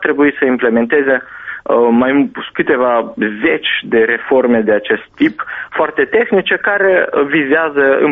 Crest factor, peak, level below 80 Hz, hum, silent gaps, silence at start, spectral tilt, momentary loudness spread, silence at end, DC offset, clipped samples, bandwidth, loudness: 12 dB; 0 dBFS; -54 dBFS; none; none; 0 s; -2.5 dB/octave; 6 LU; 0 s; under 0.1%; under 0.1%; 3.9 kHz; -13 LUFS